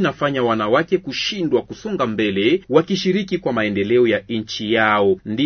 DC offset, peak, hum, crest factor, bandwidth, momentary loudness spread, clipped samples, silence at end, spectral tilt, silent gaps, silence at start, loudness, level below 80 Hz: under 0.1%; -2 dBFS; none; 18 dB; 6.6 kHz; 6 LU; under 0.1%; 0 s; -5.5 dB/octave; none; 0 s; -19 LUFS; -54 dBFS